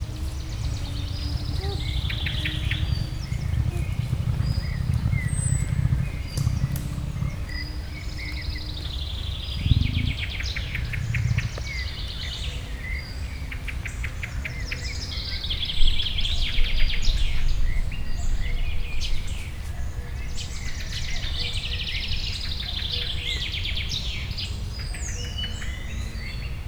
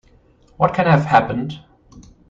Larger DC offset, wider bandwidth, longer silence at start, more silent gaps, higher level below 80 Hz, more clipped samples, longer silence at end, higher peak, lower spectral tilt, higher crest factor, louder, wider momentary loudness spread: neither; first, 16.5 kHz vs 7.6 kHz; second, 0 s vs 0.6 s; neither; first, -28 dBFS vs -48 dBFS; neither; second, 0 s vs 0.3 s; about the same, -4 dBFS vs -2 dBFS; second, -4 dB/octave vs -8 dB/octave; about the same, 22 dB vs 18 dB; second, -28 LUFS vs -17 LUFS; second, 8 LU vs 16 LU